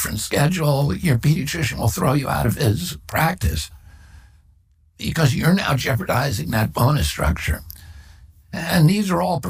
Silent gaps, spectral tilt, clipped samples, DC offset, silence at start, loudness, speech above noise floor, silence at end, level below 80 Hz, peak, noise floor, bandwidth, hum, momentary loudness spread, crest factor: none; -5.5 dB/octave; under 0.1%; under 0.1%; 0 s; -20 LUFS; 36 dB; 0 s; -34 dBFS; -4 dBFS; -56 dBFS; 16 kHz; none; 10 LU; 18 dB